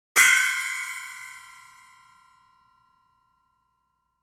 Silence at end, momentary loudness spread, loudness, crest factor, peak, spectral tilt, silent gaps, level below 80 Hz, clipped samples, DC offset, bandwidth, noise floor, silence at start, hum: 2.85 s; 25 LU; -21 LUFS; 24 dB; -4 dBFS; 3.5 dB/octave; none; -82 dBFS; under 0.1%; under 0.1%; 17 kHz; -74 dBFS; 0.15 s; none